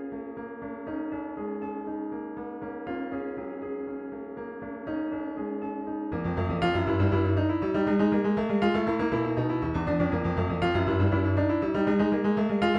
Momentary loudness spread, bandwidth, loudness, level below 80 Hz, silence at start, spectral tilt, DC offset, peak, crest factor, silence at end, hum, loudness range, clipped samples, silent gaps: 13 LU; 7.2 kHz; -28 LUFS; -48 dBFS; 0 s; -9 dB/octave; under 0.1%; -12 dBFS; 16 dB; 0 s; none; 10 LU; under 0.1%; none